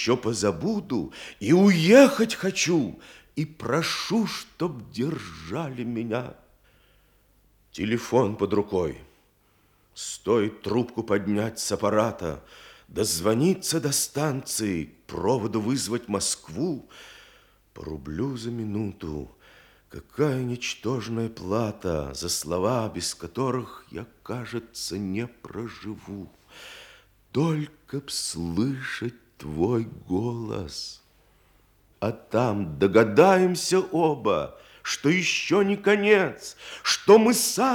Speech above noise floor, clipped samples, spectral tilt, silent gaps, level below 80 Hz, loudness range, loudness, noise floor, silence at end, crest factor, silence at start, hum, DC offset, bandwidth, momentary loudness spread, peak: 38 dB; under 0.1%; -4.5 dB/octave; none; -56 dBFS; 11 LU; -25 LUFS; -63 dBFS; 0 s; 24 dB; 0 s; none; under 0.1%; 19.5 kHz; 18 LU; -2 dBFS